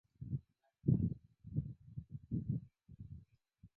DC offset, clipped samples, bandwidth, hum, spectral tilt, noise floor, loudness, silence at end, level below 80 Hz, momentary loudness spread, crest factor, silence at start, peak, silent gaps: under 0.1%; under 0.1%; 1 kHz; none; -15.5 dB/octave; -67 dBFS; -42 LUFS; 0.1 s; -58 dBFS; 19 LU; 22 dB; 0.2 s; -20 dBFS; none